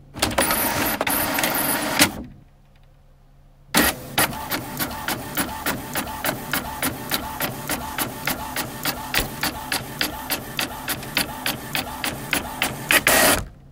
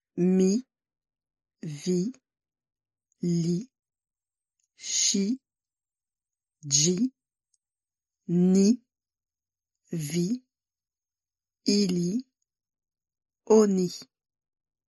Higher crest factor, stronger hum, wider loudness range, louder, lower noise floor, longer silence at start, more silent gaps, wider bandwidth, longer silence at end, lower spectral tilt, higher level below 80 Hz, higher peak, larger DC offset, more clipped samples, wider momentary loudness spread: about the same, 24 dB vs 20 dB; neither; about the same, 4 LU vs 6 LU; first, -22 LUFS vs -26 LUFS; second, -51 dBFS vs under -90 dBFS; second, 0 s vs 0.15 s; neither; first, 16.5 kHz vs 12 kHz; second, 0 s vs 0.85 s; second, -2 dB/octave vs -5 dB/octave; first, -44 dBFS vs -74 dBFS; first, 0 dBFS vs -8 dBFS; neither; neither; second, 9 LU vs 14 LU